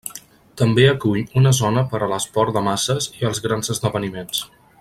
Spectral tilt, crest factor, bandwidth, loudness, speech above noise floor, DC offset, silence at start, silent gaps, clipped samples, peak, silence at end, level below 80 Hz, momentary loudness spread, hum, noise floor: -5 dB/octave; 18 dB; 15.5 kHz; -19 LUFS; 23 dB; under 0.1%; 0.05 s; none; under 0.1%; -2 dBFS; 0.35 s; -50 dBFS; 11 LU; none; -42 dBFS